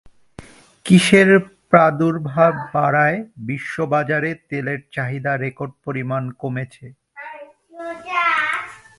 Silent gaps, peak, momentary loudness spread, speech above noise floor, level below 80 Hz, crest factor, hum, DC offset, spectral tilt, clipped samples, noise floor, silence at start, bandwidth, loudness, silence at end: none; 0 dBFS; 19 LU; 25 dB; -58 dBFS; 20 dB; none; under 0.1%; -6 dB/octave; under 0.1%; -42 dBFS; 0.4 s; 11.5 kHz; -18 LUFS; 0.2 s